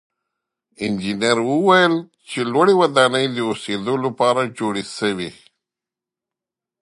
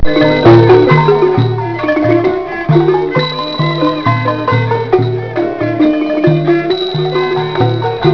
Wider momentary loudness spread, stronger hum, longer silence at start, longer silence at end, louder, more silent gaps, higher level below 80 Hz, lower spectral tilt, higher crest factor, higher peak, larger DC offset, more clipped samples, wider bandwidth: about the same, 11 LU vs 9 LU; neither; first, 0.8 s vs 0 s; first, 1.5 s vs 0 s; second, -18 LUFS vs -11 LUFS; neither; second, -62 dBFS vs -34 dBFS; second, -4.5 dB/octave vs -8.5 dB/octave; first, 20 dB vs 10 dB; about the same, 0 dBFS vs 0 dBFS; neither; second, under 0.1% vs 0.5%; first, 11.5 kHz vs 5.4 kHz